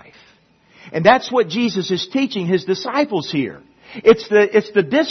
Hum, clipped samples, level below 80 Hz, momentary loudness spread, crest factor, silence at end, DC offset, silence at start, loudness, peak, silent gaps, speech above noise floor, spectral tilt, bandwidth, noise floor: none; under 0.1%; -58 dBFS; 9 LU; 18 dB; 0 s; under 0.1%; 0.85 s; -17 LUFS; 0 dBFS; none; 37 dB; -5.5 dB/octave; 6.4 kHz; -53 dBFS